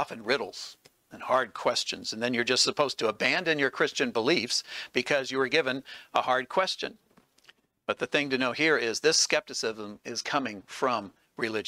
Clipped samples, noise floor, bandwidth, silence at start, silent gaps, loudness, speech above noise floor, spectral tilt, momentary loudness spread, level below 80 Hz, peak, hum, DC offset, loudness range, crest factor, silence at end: under 0.1%; -61 dBFS; 16 kHz; 0 s; none; -27 LUFS; 33 dB; -2 dB/octave; 11 LU; -74 dBFS; -8 dBFS; none; under 0.1%; 3 LU; 22 dB; 0 s